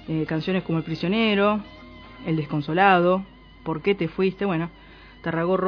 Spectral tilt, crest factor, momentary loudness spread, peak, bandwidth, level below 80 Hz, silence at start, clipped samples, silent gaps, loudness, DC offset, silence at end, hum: -8.5 dB/octave; 20 dB; 17 LU; -4 dBFS; 5.4 kHz; -52 dBFS; 0 s; under 0.1%; none; -23 LUFS; under 0.1%; 0 s; none